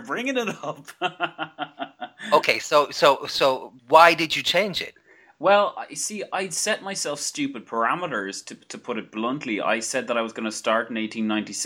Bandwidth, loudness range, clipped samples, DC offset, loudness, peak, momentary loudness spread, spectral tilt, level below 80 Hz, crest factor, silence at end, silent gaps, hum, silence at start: 18 kHz; 7 LU; under 0.1%; under 0.1%; -23 LUFS; 0 dBFS; 14 LU; -2.5 dB/octave; -68 dBFS; 22 dB; 0 s; none; none; 0 s